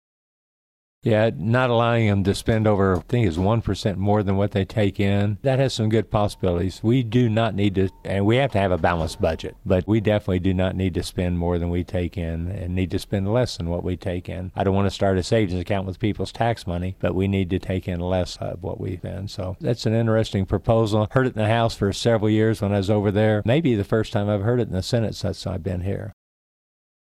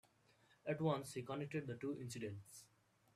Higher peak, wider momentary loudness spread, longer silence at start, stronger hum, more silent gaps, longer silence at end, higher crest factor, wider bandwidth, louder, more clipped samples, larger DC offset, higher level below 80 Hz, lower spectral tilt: first, -6 dBFS vs -26 dBFS; second, 8 LU vs 14 LU; first, 1.05 s vs 0.65 s; neither; neither; first, 1 s vs 0.5 s; about the same, 16 dB vs 20 dB; second, 13 kHz vs 14.5 kHz; first, -22 LUFS vs -45 LUFS; neither; neither; first, -42 dBFS vs -80 dBFS; about the same, -7 dB/octave vs -6 dB/octave